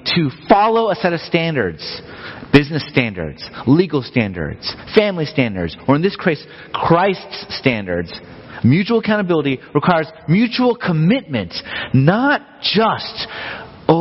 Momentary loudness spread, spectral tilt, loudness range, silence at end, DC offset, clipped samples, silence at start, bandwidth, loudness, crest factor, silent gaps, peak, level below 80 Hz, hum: 12 LU; -8.5 dB/octave; 2 LU; 0 s; under 0.1%; under 0.1%; 0.05 s; 6 kHz; -17 LUFS; 16 dB; none; 0 dBFS; -44 dBFS; none